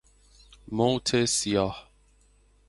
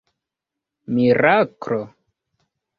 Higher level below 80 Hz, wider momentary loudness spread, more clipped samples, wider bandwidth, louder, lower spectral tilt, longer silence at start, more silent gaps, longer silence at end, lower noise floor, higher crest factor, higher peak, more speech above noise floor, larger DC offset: first, -54 dBFS vs -60 dBFS; about the same, 11 LU vs 12 LU; neither; first, 11.5 kHz vs 6.6 kHz; second, -26 LUFS vs -19 LUFS; second, -4 dB/octave vs -8 dB/octave; second, 0.7 s vs 0.9 s; neither; about the same, 0.85 s vs 0.9 s; second, -61 dBFS vs -85 dBFS; about the same, 20 dB vs 20 dB; second, -10 dBFS vs -2 dBFS; second, 36 dB vs 67 dB; neither